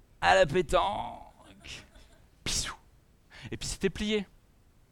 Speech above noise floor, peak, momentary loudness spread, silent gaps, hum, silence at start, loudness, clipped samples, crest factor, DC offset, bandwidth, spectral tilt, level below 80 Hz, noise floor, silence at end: 34 dB; -10 dBFS; 24 LU; none; none; 0.2 s; -29 LUFS; under 0.1%; 22 dB; under 0.1%; 18 kHz; -3.5 dB/octave; -46 dBFS; -61 dBFS; 0.65 s